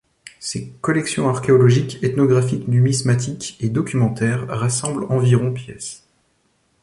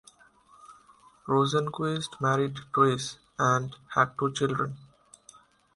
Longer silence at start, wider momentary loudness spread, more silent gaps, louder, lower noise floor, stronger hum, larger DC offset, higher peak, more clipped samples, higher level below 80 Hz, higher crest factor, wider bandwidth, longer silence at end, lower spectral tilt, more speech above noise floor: second, 0.4 s vs 0.7 s; first, 12 LU vs 9 LU; neither; first, -19 LUFS vs -27 LUFS; first, -64 dBFS vs -59 dBFS; neither; neither; first, -4 dBFS vs -8 dBFS; neither; first, -52 dBFS vs -64 dBFS; second, 16 dB vs 22 dB; about the same, 11.5 kHz vs 11.5 kHz; about the same, 0.85 s vs 0.9 s; about the same, -6 dB/octave vs -5 dB/octave; first, 46 dB vs 32 dB